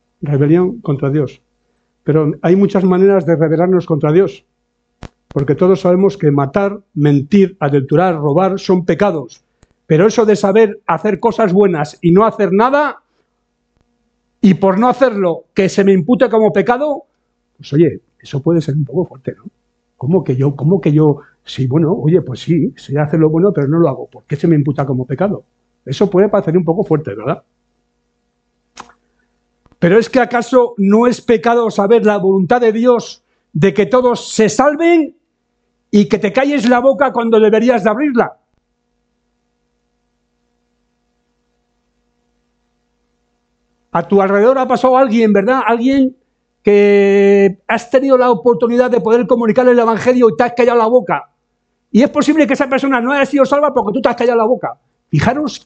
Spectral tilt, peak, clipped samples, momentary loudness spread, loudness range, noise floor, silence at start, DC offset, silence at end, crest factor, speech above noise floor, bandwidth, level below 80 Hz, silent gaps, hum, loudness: -7.5 dB/octave; 0 dBFS; under 0.1%; 8 LU; 6 LU; -67 dBFS; 0.2 s; under 0.1%; 0.1 s; 14 dB; 55 dB; 8.6 kHz; -50 dBFS; none; 50 Hz at -40 dBFS; -13 LUFS